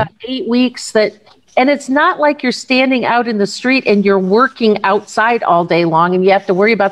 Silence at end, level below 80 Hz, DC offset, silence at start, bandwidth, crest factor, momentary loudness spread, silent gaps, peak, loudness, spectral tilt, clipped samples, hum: 0 s; -60 dBFS; 0.1%; 0 s; 11.5 kHz; 12 dB; 5 LU; none; 0 dBFS; -13 LUFS; -5 dB/octave; under 0.1%; none